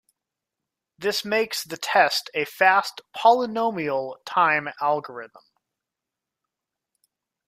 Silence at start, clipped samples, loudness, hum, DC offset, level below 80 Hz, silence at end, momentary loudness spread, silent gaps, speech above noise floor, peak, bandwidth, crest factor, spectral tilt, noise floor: 1 s; under 0.1%; -22 LUFS; none; under 0.1%; -74 dBFS; 2.1 s; 10 LU; none; 63 dB; -4 dBFS; 15.5 kHz; 22 dB; -3 dB/octave; -86 dBFS